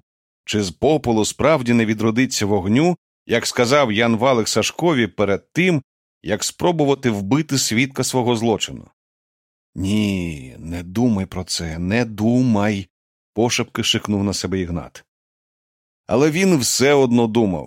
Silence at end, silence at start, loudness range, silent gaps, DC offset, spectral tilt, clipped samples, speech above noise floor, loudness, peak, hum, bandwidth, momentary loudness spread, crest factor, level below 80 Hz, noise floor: 0 s; 0.5 s; 5 LU; 2.98-3.26 s, 5.84-6.21 s, 8.93-9.73 s, 12.90-13.33 s, 15.08-16.04 s; under 0.1%; -4.5 dB/octave; under 0.1%; over 72 dB; -19 LUFS; -2 dBFS; none; 16.5 kHz; 11 LU; 16 dB; -48 dBFS; under -90 dBFS